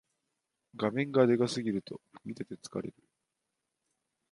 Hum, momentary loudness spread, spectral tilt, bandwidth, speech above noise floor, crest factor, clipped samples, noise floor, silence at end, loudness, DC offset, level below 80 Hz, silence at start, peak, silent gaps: none; 19 LU; -6 dB/octave; 11.5 kHz; 54 dB; 22 dB; under 0.1%; -85 dBFS; 1.4 s; -31 LUFS; under 0.1%; -74 dBFS; 0.75 s; -12 dBFS; none